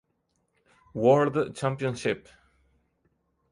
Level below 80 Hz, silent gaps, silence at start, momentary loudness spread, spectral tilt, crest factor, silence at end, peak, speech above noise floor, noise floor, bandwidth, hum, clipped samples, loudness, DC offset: -64 dBFS; none; 0.95 s; 12 LU; -6.5 dB/octave; 20 dB; 1.35 s; -8 dBFS; 50 dB; -75 dBFS; 11.5 kHz; none; under 0.1%; -26 LUFS; under 0.1%